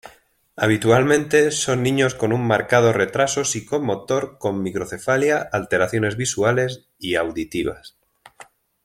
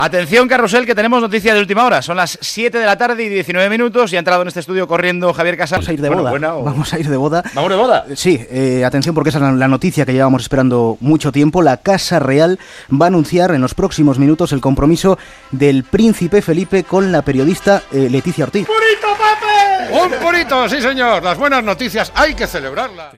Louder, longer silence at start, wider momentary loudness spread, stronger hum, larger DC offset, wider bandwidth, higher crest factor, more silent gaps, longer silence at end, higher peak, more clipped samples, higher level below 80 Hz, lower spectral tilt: second, -20 LUFS vs -13 LUFS; about the same, 0.05 s vs 0 s; first, 9 LU vs 5 LU; neither; neither; about the same, 16 kHz vs 16 kHz; first, 18 dB vs 12 dB; neither; first, 0.4 s vs 0.1 s; about the same, -2 dBFS vs 0 dBFS; neither; second, -52 dBFS vs -38 dBFS; about the same, -4.5 dB/octave vs -5.5 dB/octave